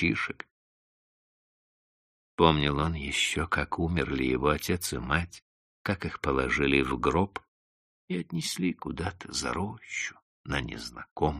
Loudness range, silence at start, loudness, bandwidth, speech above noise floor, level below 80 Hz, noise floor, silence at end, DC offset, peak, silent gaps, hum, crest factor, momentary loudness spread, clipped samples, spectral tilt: 6 LU; 0 s; -29 LUFS; 13 kHz; over 61 dB; -44 dBFS; under -90 dBFS; 0 s; under 0.1%; -4 dBFS; 0.51-2.38 s, 5.42-5.85 s, 7.48-8.08 s, 10.22-10.44 s, 11.11-11.16 s; none; 26 dB; 13 LU; under 0.1%; -4.5 dB/octave